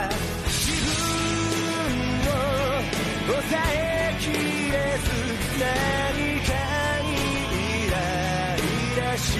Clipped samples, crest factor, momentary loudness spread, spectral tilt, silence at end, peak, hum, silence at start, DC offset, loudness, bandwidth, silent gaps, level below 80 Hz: under 0.1%; 12 dB; 2 LU; -4 dB/octave; 0 s; -12 dBFS; none; 0 s; under 0.1%; -24 LUFS; 13.5 kHz; none; -34 dBFS